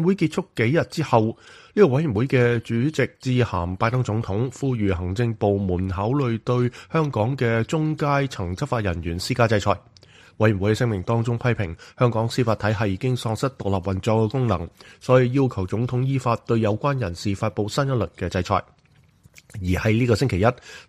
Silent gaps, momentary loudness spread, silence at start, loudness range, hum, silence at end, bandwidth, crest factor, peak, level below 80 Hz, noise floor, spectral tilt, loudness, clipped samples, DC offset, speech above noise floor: none; 6 LU; 0 s; 2 LU; none; 0.05 s; 13 kHz; 20 dB; -2 dBFS; -46 dBFS; -56 dBFS; -7 dB/octave; -23 LUFS; under 0.1%; under 0.1%; 34 dB